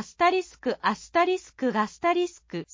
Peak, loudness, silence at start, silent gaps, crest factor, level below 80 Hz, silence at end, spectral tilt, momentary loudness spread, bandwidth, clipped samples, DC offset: -10 dBFS; -26 LUFS; 0 s; none; 18 dB; -62 dBFS; 0.1 s; -4.5 dB/octave; 7 LU; 7.6 kHz; under 0.1%; under 0.1%